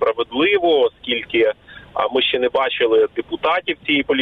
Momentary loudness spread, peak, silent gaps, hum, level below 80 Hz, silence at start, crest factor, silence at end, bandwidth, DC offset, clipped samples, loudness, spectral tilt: 6 LU; -4 dBFS; none; none; -54 dBFS; 0 s; 14 dB; 0 s; 4.6 kHz; under 0.1%; under 0.1%; -18 LUFS; -6 dB/octave